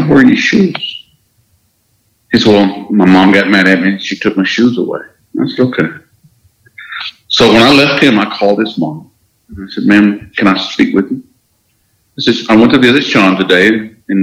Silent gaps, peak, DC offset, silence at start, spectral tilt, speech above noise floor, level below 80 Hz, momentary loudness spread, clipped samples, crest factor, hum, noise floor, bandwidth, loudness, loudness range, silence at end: none; 0 dBFS; under 0.1%; 0 s; -5.5 dB/octave; 48 dB; -44 dBFS; 15 LU; 0.8%; 10 dB; none; -57 dBFS; 13 kHz; -9 LUFS; 4 LU; 0 s